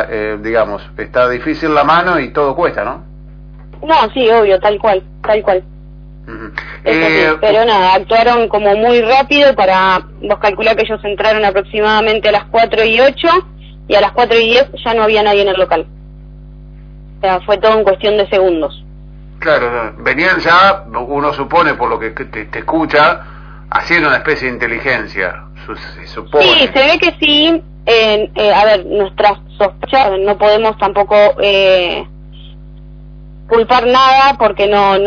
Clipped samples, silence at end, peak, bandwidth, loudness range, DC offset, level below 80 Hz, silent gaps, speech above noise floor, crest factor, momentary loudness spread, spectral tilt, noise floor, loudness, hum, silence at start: under 0.1%; 0 s; 0 dBFS; 5.4 kHz; 4 LU; under 0.1%; -34 dBFS; none; 22 dB; 12 dB; 11 LU; -5 dB/octave; -33 dBFS; -11 LUFS; 50 Hz at -35 dBFS; 0 s